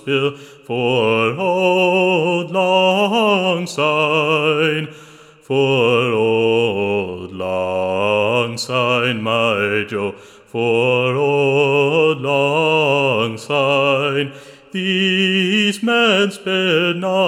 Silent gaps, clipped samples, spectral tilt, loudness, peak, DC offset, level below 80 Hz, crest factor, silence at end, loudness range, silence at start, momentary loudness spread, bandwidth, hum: none; under 0.1%; -5 dB/octave; -16 LUFS; -2 dBFS; under 0.1%; -66 dBFS; 14 dB; 0 s; 3 LU; 0.05 s; 8 LU; 16 kHz; none